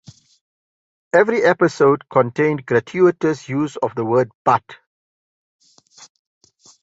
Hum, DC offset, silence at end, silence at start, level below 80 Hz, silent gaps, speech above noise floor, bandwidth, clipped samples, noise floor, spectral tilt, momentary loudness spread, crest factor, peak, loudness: none; under 0.1%; 2.1 s; 1.15 s; -62 dBFS; 4.35-4.45 s; 31 dB; 8 kHz; under 0.1%; -48 dBFS; -6.5 dB/octave; 7 LU; 18 dB; -2 dBFS; -18 LUFS